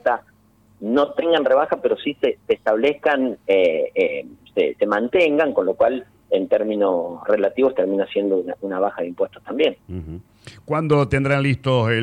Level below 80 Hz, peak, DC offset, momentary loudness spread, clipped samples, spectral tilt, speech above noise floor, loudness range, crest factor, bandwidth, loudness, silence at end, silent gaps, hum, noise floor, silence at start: -50 dBFS; -6 dBFS; under 0.1%; 9 LU; under 0.1%; -7.5 dB/octave; 36 dB; 3 LU; 14 dB; 9.6 kHz; -20 LUFS; 0 s; none; none; -55 dBFS; 0.05 s